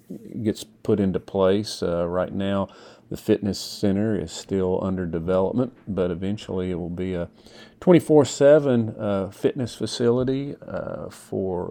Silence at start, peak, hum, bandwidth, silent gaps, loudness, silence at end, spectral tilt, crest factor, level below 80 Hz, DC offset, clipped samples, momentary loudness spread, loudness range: 0.1 s; -4 dBFS; none; 19 kHz; none; -23 LUFS; 0 s; -6.5 dB/octave; 20 dB; -52 dBFS; under 0.1%; under 0.1%; 14 LU; 5 LU